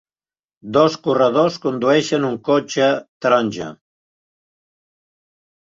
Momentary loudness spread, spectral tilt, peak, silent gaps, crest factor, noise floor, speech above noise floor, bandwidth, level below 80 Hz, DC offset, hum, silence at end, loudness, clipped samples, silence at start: 5 LU; -5 dB/octave; -2 dBFS; 3.09-3.21 s; 18 dB; under -90 dBFS; over 73 dB; 7.8 kHz; -64 dBFS; under 0.1%; none; 2 s; -18 LUFS; under 0.1%; 0.65 s